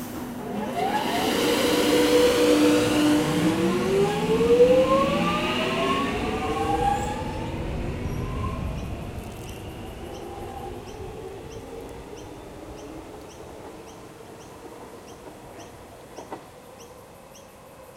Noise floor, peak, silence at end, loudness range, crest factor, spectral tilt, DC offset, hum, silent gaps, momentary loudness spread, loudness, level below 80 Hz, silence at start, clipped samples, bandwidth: -46 dBFS; -6 dBFS; 0 s; 22 LU; 18 dB; -5 dB/octave; under 0.1%; none; none; 24 LU; -23 LUFS; -42 dBFS; 0 s; under 0.1%; 16 kHz